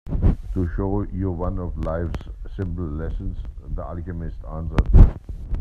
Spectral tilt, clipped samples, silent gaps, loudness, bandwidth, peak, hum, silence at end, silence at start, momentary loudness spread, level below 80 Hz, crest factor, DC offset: -10 dB/octave; under 0.1%; none; -25 LUFS; 4.5 kHz; 0 dBFS; none; 0 s; 0.05 s; 16 LU; -22 dBFS; 20 dB; under 0.1%